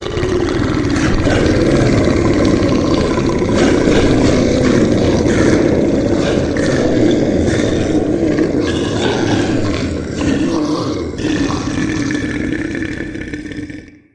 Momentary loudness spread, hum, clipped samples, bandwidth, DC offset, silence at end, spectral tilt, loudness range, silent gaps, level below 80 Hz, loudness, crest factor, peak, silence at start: 8 LU; none; under 0.1%; 10.5 kHz; under 0.1%; 0.25 s; -6 dB/octave; 5 LU; none; -28 dBFS; -14 LUFS; 14 dB; 0 dBFS; 0 s